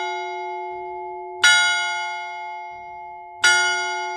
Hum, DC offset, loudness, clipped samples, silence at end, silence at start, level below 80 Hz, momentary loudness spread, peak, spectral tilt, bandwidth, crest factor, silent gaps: none; under 0.1%; -19 LUFS; under 0.1%; 0 s; 0 s; -64 dBFS; 21 LU; -2 dBFS; 1.5 dB/octave; 15.5 kHz; 20 dB; none